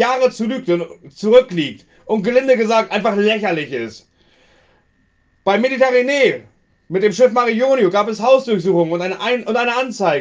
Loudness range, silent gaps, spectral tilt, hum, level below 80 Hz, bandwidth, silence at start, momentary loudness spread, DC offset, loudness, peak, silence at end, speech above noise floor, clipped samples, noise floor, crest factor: 4 LU; none; -5 dB/octave; none; -60 dBFS; 7.8 kHz; 0 s; 10 LU; under 0.1%; -16 LUFS; 0 dBFS; 0 s; 44 dB; under 0.1%; -59 dBFS; 16 dB